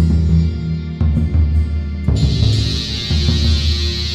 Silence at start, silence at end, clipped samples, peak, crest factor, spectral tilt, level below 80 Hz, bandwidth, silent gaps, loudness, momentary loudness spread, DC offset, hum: 0 s; 0 s; under 0.1%; -2 dBFS; 12 dB; -6 dB/octave; -18 dBFS; 9 kHz; none; -17 LUFS; 5 LU; 0.2%; none